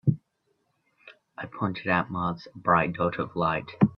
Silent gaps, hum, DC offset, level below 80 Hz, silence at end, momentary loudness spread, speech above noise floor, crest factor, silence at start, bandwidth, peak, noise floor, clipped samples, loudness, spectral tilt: none; none; under 0.1%; -58 dBFS; 0 s; 15 LU; 47 dB; 22 dB; 0.05 s; 5.8 kHz; -6 dBFS; -74 dBFS; under 0.1%; -27 LUFS; -9.5 dB/octave